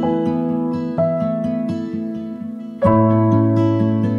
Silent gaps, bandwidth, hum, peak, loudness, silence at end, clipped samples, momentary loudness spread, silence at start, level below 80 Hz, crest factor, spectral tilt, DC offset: none; 5.6 kHz; none; -2 dBFS; -18 LUFS; 0 s; under 0.1%; 12 LU; 0 s; -50 dBFS; 14 dB; -10.5 dB/octave; under 0.1%